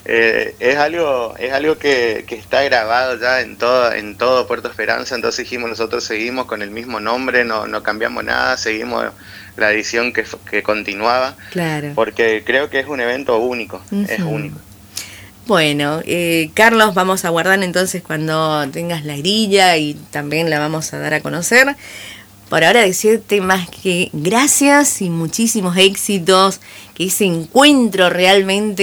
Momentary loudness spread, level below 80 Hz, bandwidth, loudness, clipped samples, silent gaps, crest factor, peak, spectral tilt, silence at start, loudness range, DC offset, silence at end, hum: 11 LU; -52 dBFS; over 20 kHz; -15 LUFS; under 0.1%; none; 16 dB; 0 dBFS; -3.5 dB/octave; 0.05 s; 5 LU; under 0.1%; 0 s; none